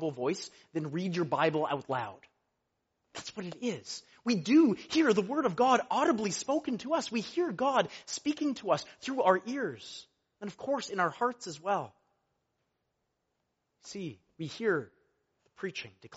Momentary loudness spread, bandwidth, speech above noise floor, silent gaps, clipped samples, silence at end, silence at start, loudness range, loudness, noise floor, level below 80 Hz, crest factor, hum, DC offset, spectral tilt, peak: 16 LU; 8 kHz; 50 dB; none; under 0.1%; 0 s; 0 s; 11 LU; -31 LUFS; -82 dBFS; -76 dBFS; 22 dB; none; under 0.1%; -4 dB/octave; -10 dBFS